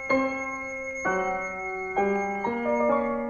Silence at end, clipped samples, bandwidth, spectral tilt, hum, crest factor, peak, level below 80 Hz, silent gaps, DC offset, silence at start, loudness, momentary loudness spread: 0 s; under 0.1%; 7 kHz; -5.5 dB/octave; none; 16 dB; -12 dBFS; -56 dBFS; none; under 0.1%; 0 s; -27 LUFS; 7 LU